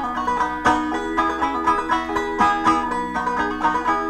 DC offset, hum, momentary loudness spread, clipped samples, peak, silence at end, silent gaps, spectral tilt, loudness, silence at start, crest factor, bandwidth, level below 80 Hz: under 0.1%; none; 4 LU; under 0.1%; -6 dBFS; 0 s; none; -4.5 dB/octave; -21 LUFS; 0 s; 16 dB; 13.5 kHz; -44 dBFS